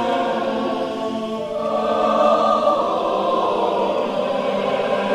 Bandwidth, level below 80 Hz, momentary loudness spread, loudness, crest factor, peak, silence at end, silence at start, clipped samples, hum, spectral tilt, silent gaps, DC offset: 11.5 kHz; -58 dBFS; 8 LU; -20 LUFS; 14 dB; -4 dBFS; 0 s; 0 s; under 0.1%; none; -5.5 dB/octave; none; under 0.1%